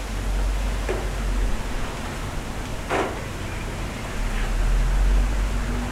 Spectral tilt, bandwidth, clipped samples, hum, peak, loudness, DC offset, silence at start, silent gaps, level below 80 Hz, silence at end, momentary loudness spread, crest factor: -5 dB/octave; 14 kHz; under 0.1%; none; -12 dBFS; -27 LUFS; under 0.1%; 0 s; none; -24 dBFS; 0 s; 7 LU; 12 dB